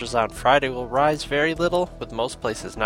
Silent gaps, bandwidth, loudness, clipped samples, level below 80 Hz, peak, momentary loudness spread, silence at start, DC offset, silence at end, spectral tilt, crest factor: none; 16 kHz; -23 LUFS; under 0.1%; -42 dBFS; -2 dBFS; 9 LU; 0 s; under 0.1%; 0 s; -4.5 dB/octave; 22 dB